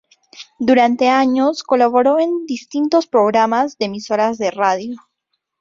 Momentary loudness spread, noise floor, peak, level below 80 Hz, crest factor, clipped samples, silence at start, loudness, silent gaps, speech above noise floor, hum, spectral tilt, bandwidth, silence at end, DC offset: 10 LU; -73 dBFS; -2 dBFS; -62 dBFS; 14 dB; under 0.1%; 0.35 s; -16 LUFS; none; 58 dB; none; -4.5 dB/octave; 7.6 kHz; 0.65 s; under 0.1%